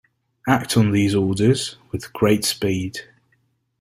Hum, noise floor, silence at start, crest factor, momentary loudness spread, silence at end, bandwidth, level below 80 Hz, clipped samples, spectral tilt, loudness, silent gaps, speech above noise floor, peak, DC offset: none; -66 dBFS; 0.45 s; 18 dB; 13 LU; 0.75 s; 16 kHz; -52 dBFS; under 0.1%; -5.5 dB/octave; -20 LUFS; none; 47 dB; -2 dBFS; under 0.1%